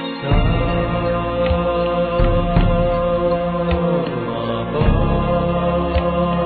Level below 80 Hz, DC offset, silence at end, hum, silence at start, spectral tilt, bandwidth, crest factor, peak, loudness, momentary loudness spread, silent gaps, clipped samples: -24 dBFS; under 0.1%; 0 s; none; 0 s; -11 dB/octave; 4.7 kHz; 16 dB; -2 dBFS; -18 LUFS; 3 LU; none; under 0.1%